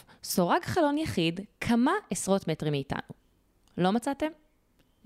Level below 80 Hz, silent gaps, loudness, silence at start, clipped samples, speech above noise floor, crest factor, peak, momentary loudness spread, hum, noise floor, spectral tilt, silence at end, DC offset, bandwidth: -58 dBFS; none; -29 LUFS; 0.25 s; under 0.1%; 39 dB; 18 dB; -12 dBFS; 9 LU; none; -67 dBFS; -5 dB/octave; 0.7 s; under 0.1%; 16 kHz